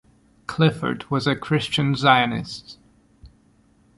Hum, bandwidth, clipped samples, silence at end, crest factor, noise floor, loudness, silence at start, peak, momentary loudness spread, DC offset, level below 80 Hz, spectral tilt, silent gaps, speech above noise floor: none; 11.5 kHz; under 0.1%; 0.7 s; 22 dB; -58 dBFS; -21 LUFS; 0.5 s; -2 dBFS; 17 LU; under 0.1%; -54 dBFS; -6 dB/octave; none; 37 dB